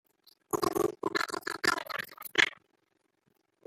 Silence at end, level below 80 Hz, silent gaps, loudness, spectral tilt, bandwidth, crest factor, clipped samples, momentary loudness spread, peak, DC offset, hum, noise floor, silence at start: 1.15 s; -70 dBFS; none; -31 LUFS; -2.5 dB/octave; 16.5 kHz; 28 dB; under 0.1%; 9 LU; -6 dBFS; under 0.1%; none; -76 dBFS; 0.55 s